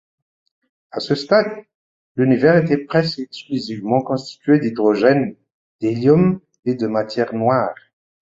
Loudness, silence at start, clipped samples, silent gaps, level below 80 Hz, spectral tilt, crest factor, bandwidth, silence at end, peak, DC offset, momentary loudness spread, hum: -18 LUFS; 0.95 s; under 0.1%; 1.75-2.15 s, 5.54-5.79 s, 6.59-6.63 s; -56 dBFS; -7.5 dB/octave; 18 dB; 7.8 kHz; 0.65 s; -2 dBFS; under 0.1%; 12 LU; none